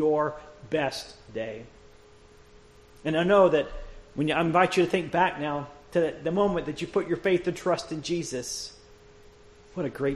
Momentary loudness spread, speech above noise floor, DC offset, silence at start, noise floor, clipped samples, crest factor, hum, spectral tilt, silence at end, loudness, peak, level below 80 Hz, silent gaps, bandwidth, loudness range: 15 LU; 27 dB; under 0.1%; 0 s; -53 dBFS; under 0.1%; 20 dB; none; -5 dB/octave; 0 s; -27 LUFS; -6 dBFS; -52 dBFS; none; 12.5 kHz; 6 LU